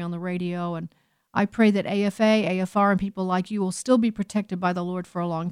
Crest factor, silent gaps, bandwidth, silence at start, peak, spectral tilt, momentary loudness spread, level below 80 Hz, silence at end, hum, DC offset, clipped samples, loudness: 16 dB; none; 12 kHz; 0 s; -8 dBFS; -6.5 dB/octave; 9 LU; -58 dBFS; 0 s; none; under 0.1%; under 0.1%; -24 LUFS